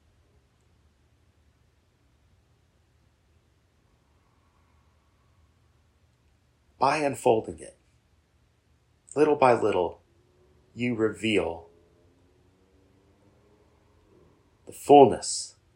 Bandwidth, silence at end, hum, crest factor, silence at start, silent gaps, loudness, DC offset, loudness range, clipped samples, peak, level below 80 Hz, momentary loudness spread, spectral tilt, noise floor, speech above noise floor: 16 kHz; 0.25 s; none; 26 dB; 6.8 s; none; -23 LUFS; under 0.1%; 8 LU; under 0.1%; -4 dBFS; -62 dBFS; 25 LU; -5 dB/octave; -66 dBFS; 43 dB